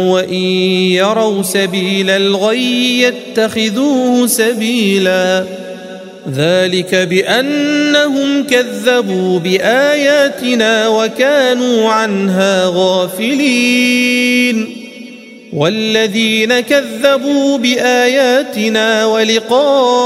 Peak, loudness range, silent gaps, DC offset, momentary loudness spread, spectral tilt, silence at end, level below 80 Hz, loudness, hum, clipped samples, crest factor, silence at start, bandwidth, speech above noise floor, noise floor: 0 dBFS; 2 LU; none; under 0.1%; 5 LU; -4 dB/octave; 0 s; -60 dBFS; -12 LUFS; none; under 0.1%; 12 dB; 0 s; 16 kHz; 21 dB; -33 dBFS